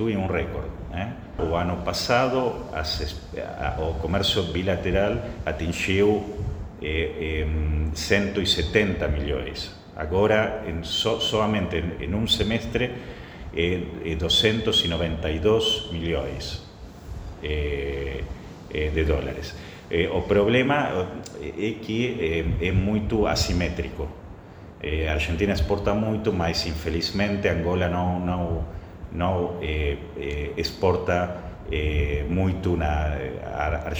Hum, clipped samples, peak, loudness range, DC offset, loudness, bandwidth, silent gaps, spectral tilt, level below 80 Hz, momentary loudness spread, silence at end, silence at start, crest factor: none; under 0.1%; -2 dBFS; 3 LU; under 0.1%; -25 LUFS; over 20 kHz; none; -5.5 dB/octave; -34 dBFS; 13 LU; 0 s; 0 s; 22 dB